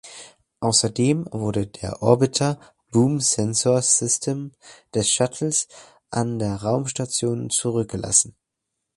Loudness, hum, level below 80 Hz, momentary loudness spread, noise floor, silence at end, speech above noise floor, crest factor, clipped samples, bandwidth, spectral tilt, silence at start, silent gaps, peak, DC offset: -21 LUFS; none; -52 dBFS; 11 LU; -80 dBFS; 0.65 s; 59 dB; 22 dB; under 0.1%; 11.5 kHz; -4 dB/octave; 0.05 s; none; 0 dBFS; under 0.1%